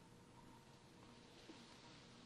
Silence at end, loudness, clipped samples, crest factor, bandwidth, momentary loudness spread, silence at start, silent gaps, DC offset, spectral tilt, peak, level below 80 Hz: 0 s; -62 LUFS; under 0.1%; 18 dB; 12 kHz; 4 LU; 0 s; none; under 0.1%; -4 dB/octave; -44 dBFS; -78 dBFS